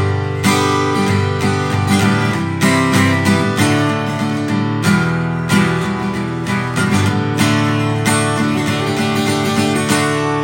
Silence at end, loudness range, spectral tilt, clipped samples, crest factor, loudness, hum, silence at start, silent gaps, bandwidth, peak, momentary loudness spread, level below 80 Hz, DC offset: 0 s; 2 LU; -5 dB/octave; under 0.1%; 14 dB; -15 LUFS; none; 0 s; none; 17 kHz; 0 dBFS; 5 LU; -48 dBFS; under 0.1%